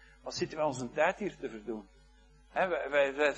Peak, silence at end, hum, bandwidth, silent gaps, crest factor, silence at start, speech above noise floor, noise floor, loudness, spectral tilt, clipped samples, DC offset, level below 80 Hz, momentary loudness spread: -14 dBFS; 0 s; none; 9.8 kHz; none; 20 dB; 0.25 s; 28 dB; -60 dBFS; -33 LUFS; -4.5 dB/octave; under 0.1%; under 0.1%; -62 dBFS; 13 LU